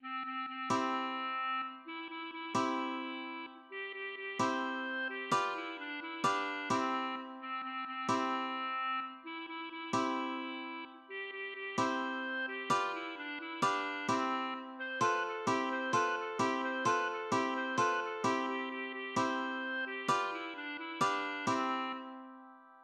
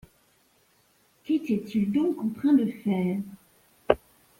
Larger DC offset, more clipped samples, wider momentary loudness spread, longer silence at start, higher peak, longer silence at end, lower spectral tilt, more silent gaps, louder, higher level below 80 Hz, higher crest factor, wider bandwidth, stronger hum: neither; neither; about the same, 10 LU vs 8 LU; second, 0 s vs 1.3 s; second, -18 dBFS vs -2 dBFS; second, 0 s vs 0.45 s; second, -3.5 dB/octave vs -8 dB/octave; neither; second, -36 LUFS vs -27 LUFS; second, -84 dBFS vs -60 dBFS; second, 18 dB vs 26 dB; second, 12 kHz vs 16.5 kHz; neither